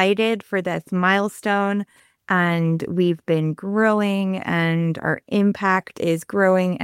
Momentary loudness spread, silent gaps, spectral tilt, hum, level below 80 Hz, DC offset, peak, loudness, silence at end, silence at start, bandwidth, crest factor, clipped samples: 6 LU; none; -6.5 dB/octave; none; -64 dBFS; under 0.1%; -4 dBFS; -21 LUFS; 0 s; 0 s; 15 kHz; 16 dB; under 0.1%